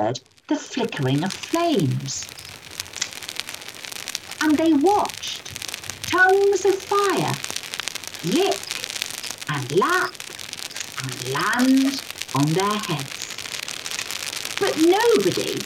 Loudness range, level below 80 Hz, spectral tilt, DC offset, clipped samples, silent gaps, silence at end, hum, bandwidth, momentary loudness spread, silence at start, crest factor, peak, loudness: 5 LU; -64 dBFS; -4 dB/octave; under 0.1%; under 0.1%; none; 0 s; none; 17.5 kHz; 13 LU; 0 s; 22 dB; 0 dBFS; -22 LUFS